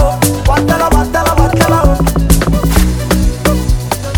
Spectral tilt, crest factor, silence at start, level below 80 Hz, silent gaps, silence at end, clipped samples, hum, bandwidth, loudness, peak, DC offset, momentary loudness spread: -5.5 dB/octave; 10 dB; 0 s; -14 dBFS; none; 0 s; 0.3%; none; 20 kHz; -12 LUFS; 0 dBFS; 0.5%; 4 LU